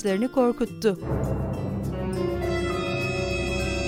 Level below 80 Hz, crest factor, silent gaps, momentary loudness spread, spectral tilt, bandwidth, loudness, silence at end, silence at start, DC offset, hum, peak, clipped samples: -38 dBFS; 16 dB; none; 6 LU; -6 dB/octave; 16 kHz; -26 LUFS; 0 s; 0 s; under 0.1%; none; -8 dBFS; under 0.1%